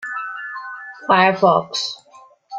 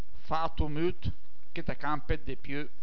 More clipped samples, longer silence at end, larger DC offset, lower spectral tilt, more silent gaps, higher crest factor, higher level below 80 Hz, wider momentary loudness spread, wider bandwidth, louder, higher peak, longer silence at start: neither; second, 0 s vs 0.15 s; second, under 0.1% vs 6%; second, -4 dB/octave vs -8 dB/octave; neither; about the same, 18 dB vs 18 dB; second, -64 dBFS vs -42 dBFS; first, 17 LU vs 8 LU; first, 9 kHz vs 5.4 kHz; first, -18 LUFS vs -35 LUFS; first, -2 dBFS vs -14 dBFS; about the same, 0 s vs 0.1 s